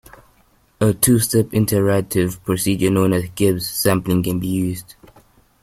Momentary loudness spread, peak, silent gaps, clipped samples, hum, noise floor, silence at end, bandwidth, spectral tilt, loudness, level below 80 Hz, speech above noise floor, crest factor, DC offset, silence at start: 6 LU; 0 dBFS; none; under 0.1%; none; -57 dBFS; 0.8 s; 16.5 kHz; -5.5 dB/octave; -18 LUFS; -46 dBFS; 39 dB; 18 dB; under 0.1%; 0.8 s